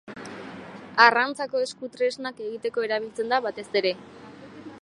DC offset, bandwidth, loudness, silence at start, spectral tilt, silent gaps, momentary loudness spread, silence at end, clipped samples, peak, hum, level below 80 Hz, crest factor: under 0.1%; 11.5 kHz; -24 LUFS; 0.05 s; -3 dB/octave; none; 25 LU; 0.05 s; under 0.1%; -2 dBFS; none; -70 dBFS; 24 dB